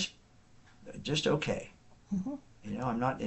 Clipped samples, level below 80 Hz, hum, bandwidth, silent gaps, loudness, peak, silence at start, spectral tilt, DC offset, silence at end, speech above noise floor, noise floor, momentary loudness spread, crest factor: under 0.1%; -58 dBFS; none; 8.2 kHz; none; -35 LUFS; -16 dBFS; 0 s; -5 dB/octave; under 0.1%; 0 s; 27 dB; -60 dBFS; 18 LU; 18 dB